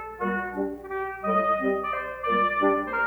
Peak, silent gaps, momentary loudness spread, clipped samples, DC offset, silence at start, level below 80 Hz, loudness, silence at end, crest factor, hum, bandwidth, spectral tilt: -10 dBFS; none; 9 LU; under 0.1%; under 0.1%; 0 s; -54 dBFS; -26 LUFS; 0 s; 16 dB; none; over 20 kHz; -7.5 dB/octave